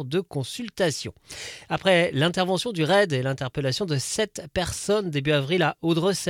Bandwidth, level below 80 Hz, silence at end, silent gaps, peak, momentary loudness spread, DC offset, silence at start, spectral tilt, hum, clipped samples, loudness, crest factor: 16.5 kHz; -52 dBFS; 0 s; none; -8 dBFS; 11 LU; under 0.1%; 0 s; -4.5 dB/octave; none; under 0.1%; -24 LUFS; 16 dB